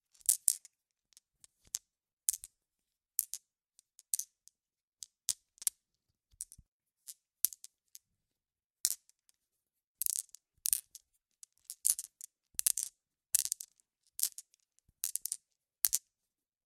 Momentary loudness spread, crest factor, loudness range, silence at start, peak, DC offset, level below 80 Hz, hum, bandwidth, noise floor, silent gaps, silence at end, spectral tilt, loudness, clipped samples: 21 LU; 38 dB; 6 LU; 0.3 s; -2 dBFS; under 0.1%; -78 dBFS; none; 16.5 kHz; under -90 dBFS; 2.13-2.17 s, 4.83-4.92 s, 6.68-6.80 s, 8.66-8.70 s, 9.87-9.95 s; 0.7 s; 3.5 dB/octave; -35 LUFS; under 0.1%